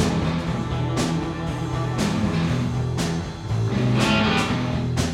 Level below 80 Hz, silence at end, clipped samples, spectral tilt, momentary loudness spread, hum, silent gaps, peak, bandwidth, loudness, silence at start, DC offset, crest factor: -38 dBFS; 0 s; under 0.1%; -5.5 dB/octave; 7 LU; none; none; -8 dBFS; 14 kHz; -23 LUFS; 0 s; under 0.1%; 16 dB